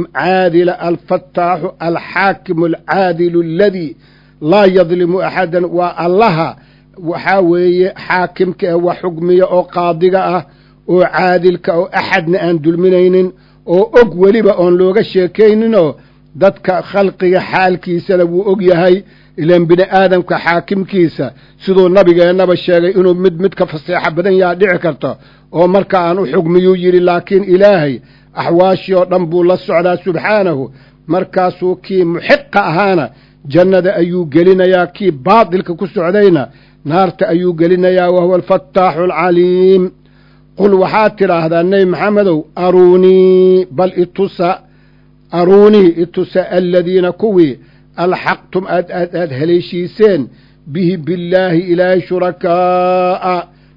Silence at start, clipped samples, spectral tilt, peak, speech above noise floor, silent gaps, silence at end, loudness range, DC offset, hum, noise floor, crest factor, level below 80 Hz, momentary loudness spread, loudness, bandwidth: 0 s; 0.8%; -9 dB/octave; 0 dBFS; 35 dB; none; 0.3 s; 3 LU; under 0.1%; none; -45 dBFS; 10 dB; -48 dBFS; 9 LU; -11 LUFS; 6 kHz